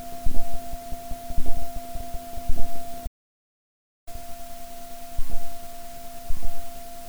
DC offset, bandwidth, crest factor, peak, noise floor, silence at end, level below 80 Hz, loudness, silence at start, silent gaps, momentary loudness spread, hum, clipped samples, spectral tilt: under 0.1%; over 20 kHz; 14 dB; -4 dBFS; -35 dBFS; 0 s; -30 dBFS; -38 LUFS; 0 s; 3.07-4.07 s; 6 LU; none; under 0.1%; -5 dB/octave